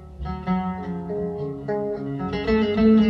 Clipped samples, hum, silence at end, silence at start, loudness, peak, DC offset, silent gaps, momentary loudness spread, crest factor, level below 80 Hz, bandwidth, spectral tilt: under 0.1%; none; 0 s; 0 s; -25 LUFS; -8 dBFS; under 0.1%; none; 11 LU; 14 dB; -40 dBFS; 6 kHz; -9 dB/octave